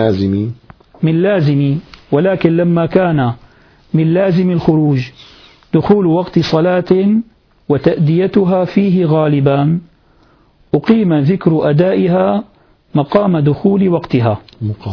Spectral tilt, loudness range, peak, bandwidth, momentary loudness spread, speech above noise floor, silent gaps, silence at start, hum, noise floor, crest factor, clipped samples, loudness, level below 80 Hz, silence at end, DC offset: -9.5 dB/octave; 1 LU; 0 dBFS; 5.4 kHz; 7 LU; 38 dB; none; 0 s; none; -50 dBFS; 14 dB; under 0.1%; -13 LUFS; -46 dBFS; 0 s; under 0.1%